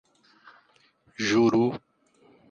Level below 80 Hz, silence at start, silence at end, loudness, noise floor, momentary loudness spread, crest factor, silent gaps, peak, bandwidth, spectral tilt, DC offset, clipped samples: -66 dBFS; 1.2 s; 0.7 s; -24 LUFS; -63 dBFS; 21 LU; 18 dB; none; -12 dBFS; 7.4 kHz; -5.5 dB/octave; under 0.1%; under 0.1%